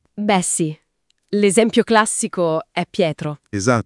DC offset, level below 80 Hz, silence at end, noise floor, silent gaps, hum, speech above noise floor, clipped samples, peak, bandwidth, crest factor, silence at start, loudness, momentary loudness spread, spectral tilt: under 0.1%; -60 dBFS; 0.05 s; -67 dBFS; none; none; 49 dB; under 0.1%; 0 dBFS; 12 kHz; 18 dB; 0.15 s; -18 LUFS; 10 LU; -4 dB/octave